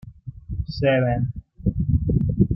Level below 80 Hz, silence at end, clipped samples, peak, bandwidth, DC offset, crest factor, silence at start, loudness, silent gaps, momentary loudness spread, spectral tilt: -34 dBFS; 0 s; under 0.1%; -4 dBFS; 5.8 kHz; under 0.1%; 18 dB; 0.05 s; -23 LUFS; none; 14 LU; -10.5 dB/octave